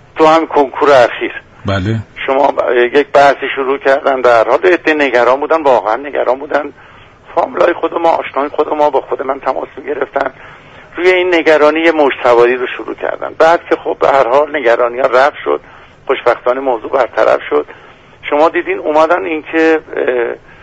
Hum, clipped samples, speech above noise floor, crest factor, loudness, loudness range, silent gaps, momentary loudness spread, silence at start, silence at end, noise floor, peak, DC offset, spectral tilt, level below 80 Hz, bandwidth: none; under 0.1%; 25 dB; 12 dB; -12 LUFS; 4 LU; none; 10 LU; 0.15 s; 0.25 s; -37 dBFS; 0 dBFS; under 0.1%; -5.5 dB/octave; -48 dBFS; 8.8 kHz